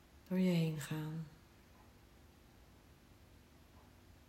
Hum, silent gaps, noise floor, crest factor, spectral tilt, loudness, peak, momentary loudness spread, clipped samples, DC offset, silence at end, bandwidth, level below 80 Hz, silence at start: none; none; -63 dBFS; 18 dB; -7 dB/octave; -38 LUFS; -24 dBFS; 28 LU; under 0.1%; under 0.1%; 0.5 s; 16 kHz; -68 dBFS; 0.15 s